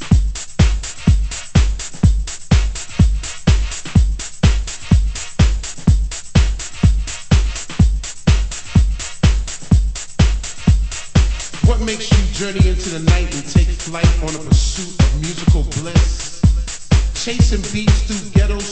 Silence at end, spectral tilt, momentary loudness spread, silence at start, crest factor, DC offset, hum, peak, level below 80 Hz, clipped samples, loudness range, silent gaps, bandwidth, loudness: 0 s; -5.5 dB/octave; 5 LU; 0 s; 14 dB; under 0.1%; none; 0 dBFS; -18 dBFS; under 0.1%; 1 LU; none; 8.8 kHz; -17 LUFS